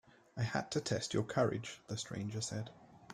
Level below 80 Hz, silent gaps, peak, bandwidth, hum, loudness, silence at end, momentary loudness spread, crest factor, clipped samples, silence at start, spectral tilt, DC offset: -68 dBFS; none; -18 dBFS; 12.5 kHz; none; -38 LUFS; 0 s; 10 LU; 20 dB; under 0.1%; 0.35 s; -5 dB/octave; under 0.1%